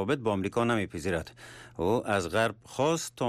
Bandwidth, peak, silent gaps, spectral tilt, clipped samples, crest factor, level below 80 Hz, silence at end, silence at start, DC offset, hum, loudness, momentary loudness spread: 15 kHz; -16 dBFS; none; -5 dB/octave; under 0.1%; 14 dB; -58 dBFS; 0 s; 0 s; under 0.1%; none; -29 LUFS; 9 LU